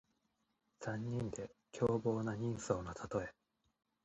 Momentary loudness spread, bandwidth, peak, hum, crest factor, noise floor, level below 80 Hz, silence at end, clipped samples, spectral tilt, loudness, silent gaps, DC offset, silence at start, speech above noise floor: 12 LU; 8.4 kHz; -20 dBFS; none; 22 dB; -83 dBFS; -64 dBFS; 0.75 s; under 0.1%; -6.5 dB/octave; -40 LUFS; none; under 0.1%; 0.8 s; 43 dB